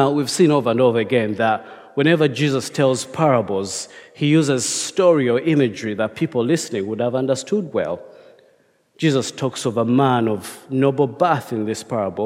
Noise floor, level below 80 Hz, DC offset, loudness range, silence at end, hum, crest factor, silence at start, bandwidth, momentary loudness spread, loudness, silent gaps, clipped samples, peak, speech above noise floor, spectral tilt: -58 dBFS; -66 dBFS; under 0.1%; 4 LU; 0 s; none; 16 dB; 0 s; 16 kHz; 8 LU; -19 LUFS; none; under 0.1%; -2 dBFS; 40 dB; -5.5 dB/octave